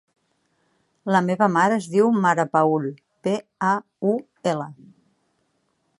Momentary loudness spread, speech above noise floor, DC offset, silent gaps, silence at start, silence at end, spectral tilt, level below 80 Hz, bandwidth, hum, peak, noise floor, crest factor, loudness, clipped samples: 11 LU; 49 dB; under 0.1%; none; 1.05 s; 1.25 s; -6.5 dB/octave; -72 dBFS; 11.5 kHz; none; -4 dBFS; -70 dBFS; 20 dB; -22 LUFS; under 0.1%